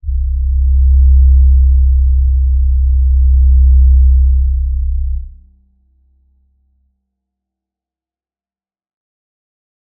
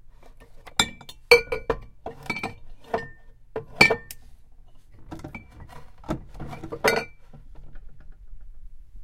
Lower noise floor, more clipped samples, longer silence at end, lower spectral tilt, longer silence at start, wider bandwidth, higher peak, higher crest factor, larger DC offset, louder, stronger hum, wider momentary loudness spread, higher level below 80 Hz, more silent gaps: first, under -90 dBFS vs -46 dBFS; neither; first, 4.7 s vs 0 s; first, -18 dB/octave vs -3 dB/octave; about the same, 0.05 s vs 0.05 s; second, 0.2 kHz vs 16.5 kHz; about the same, -2 dBFS vs 0 dBFS; second, 10 dB vs 28 dB; neither; first, -12 LUFS vs -24 LUFS; neither; second, 9 LU vs 26 LU; first, -12 dBFS vs -44 dBFS; neither